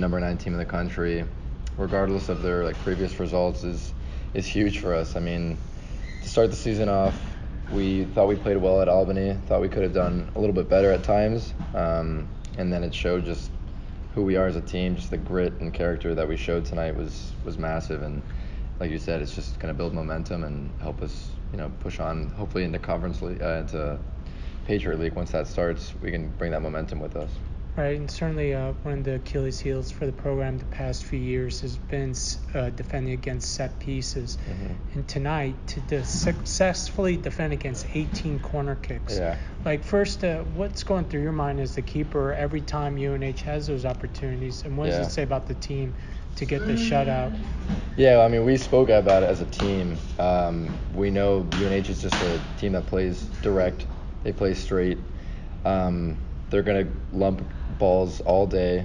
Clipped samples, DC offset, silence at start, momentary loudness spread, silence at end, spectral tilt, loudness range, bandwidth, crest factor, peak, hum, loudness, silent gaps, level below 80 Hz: under 0.1%; under 0.1%; 0 s; 12 LU; 0 s; -6 dB/octave; 8 LU; 10.5 kHz; 20 dB; -6 dBFS; none; -26 LUFS; none; -34 dBFS